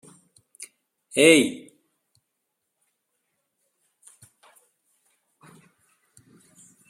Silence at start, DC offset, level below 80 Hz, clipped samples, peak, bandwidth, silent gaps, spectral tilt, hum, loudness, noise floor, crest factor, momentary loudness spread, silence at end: 0.6 s; under 0.1%; -74 dBFS; under 0.1%; -2 dBFS; 15.5 kHz; none; -3 dB/octave; none; -19 LUFS; -79 dBFS; 26 dB; 28 LU; 5.3 s